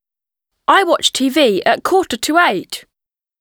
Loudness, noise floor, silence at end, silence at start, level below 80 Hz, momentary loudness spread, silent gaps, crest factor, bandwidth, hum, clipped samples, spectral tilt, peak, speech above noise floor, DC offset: -14 LUFS; -88 dBFS; 0.6 s; 0.7 s; -56 dBFS; 11 LU; none; 16 dB; over 20 kHz; none; under 0.1%; -2.5 dB/octave; 0 dBFS; 74 dB; under 0.1%